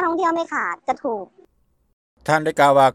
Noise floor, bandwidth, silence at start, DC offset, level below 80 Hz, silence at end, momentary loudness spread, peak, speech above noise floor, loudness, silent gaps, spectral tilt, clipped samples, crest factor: -61 dBFS; 15 kHz; 0 s; under 0.1%; -60 dBFS; 0.05 s; 15 LU; -2 dBFS; 43 dB; -20 LUFS; 1.93-2.17 s; -5 dB/octave; under 0.1%; 18 dB